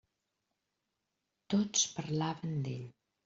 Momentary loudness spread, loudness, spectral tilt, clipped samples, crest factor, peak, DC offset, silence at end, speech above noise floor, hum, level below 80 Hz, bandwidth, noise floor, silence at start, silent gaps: 12 LU; -34 LUFS; -5.5 dB/octave; under 0.1%; 22 dB; -16 dBFS; under 0.1%; 0.35 s; 51 dB; none; -74 dBFS; 8 kHz; -86 dBFS; 1.5 s; none